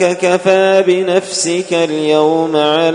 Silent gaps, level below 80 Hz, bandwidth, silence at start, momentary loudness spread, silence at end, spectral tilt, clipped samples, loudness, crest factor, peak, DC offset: none; -62 dBFS; 11 kHz; 0 s; 5 LU; 0 s; -4 dB/octave; under 0.1%; -12 LUFS; 12 dB; 0 dBFS; under 0.1%